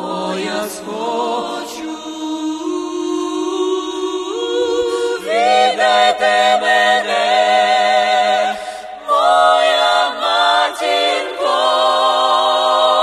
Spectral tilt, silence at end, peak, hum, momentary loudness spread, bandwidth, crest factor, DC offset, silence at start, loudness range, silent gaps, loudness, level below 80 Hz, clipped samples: -2 dB/octave; 0 s; 0 dBFS; none; 10 LU; 13 kHz; 14 dB; under 0.1%; 0 s; 8 LU; none; -15 LUFS; -58 dBFS; under 0.1%